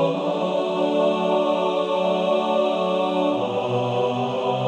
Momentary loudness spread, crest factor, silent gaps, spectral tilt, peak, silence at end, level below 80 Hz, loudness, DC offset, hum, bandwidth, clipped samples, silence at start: 3 LU; 12 dB; none; -6.5 dB/octave; -8 dBFS; 0 s; -70 dBFS; -22 LUFS; under 0.1%; none; 9 kHz; under 0.1%; 0 s